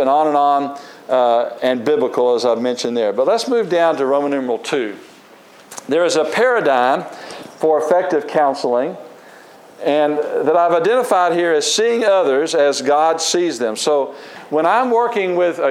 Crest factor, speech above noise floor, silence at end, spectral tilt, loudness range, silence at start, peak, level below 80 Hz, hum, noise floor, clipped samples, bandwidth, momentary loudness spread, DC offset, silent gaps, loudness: 14 dB; 28 dB; 0 s; -3 dB/octave; 4 LU; 0 s; -2 dBFS; -78 dBFS; none; -44 dBFS; under 0.1%; 15 kHz; 8 LU; under 0.1%; none; -16 LUFS